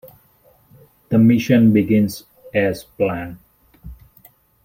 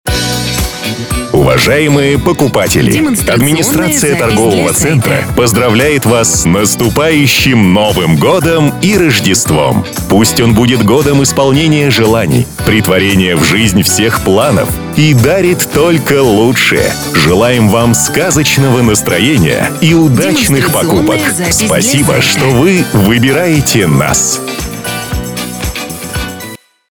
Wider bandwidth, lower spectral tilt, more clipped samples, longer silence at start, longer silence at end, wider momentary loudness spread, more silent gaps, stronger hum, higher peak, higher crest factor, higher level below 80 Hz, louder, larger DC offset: second, 16.5 kHz vs over 20 kHz; first, -7.5 dB/octave vs -4.5 dB/octave; neither; about the same, 0.05 s vs 0.05 s; first, 0.7 s vs 0.35 s; first, 14 LU vs 7 LU; neither; neither; about the same, -2 dBFS vs 0 dBFS; first, 18 dB vs 8 dB; second, -48 dBFS vs -28 dBFS; second, -17 LUFS vs -9 LUFS; neither